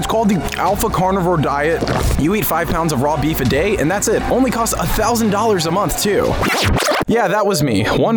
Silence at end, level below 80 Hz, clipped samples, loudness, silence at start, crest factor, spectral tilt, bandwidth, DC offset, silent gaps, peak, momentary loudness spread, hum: 0 s; -28 dBFS; under 0.1%; -16 LUFS; 0 s; 10 dB; -4.5 dB/octave; over 20 kHz; under 0.1%; none; -6 dBFS; 2 LU; none